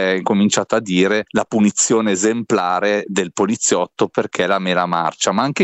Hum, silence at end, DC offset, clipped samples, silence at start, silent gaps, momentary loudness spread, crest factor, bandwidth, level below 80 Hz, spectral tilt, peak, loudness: none; 0 s; under 0.1%; under 0.1%; 0 s; none; 4 LU; 14 dB; 8.8 kHz; -60 dBFS; -4 dB/octave; -2 dBFS; -17 LUFS